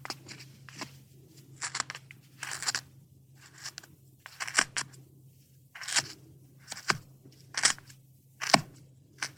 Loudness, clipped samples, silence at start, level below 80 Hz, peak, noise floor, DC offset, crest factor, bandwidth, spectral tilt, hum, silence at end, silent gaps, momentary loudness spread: -32 LUFS; under 0.1%; 0 s; -70 dBFS; -2 dBFS; -59 dBFS; under 0.1%; 34 dB; over 20 kHz; -1 dB/octave; none; 0.05 s; none; 22 LU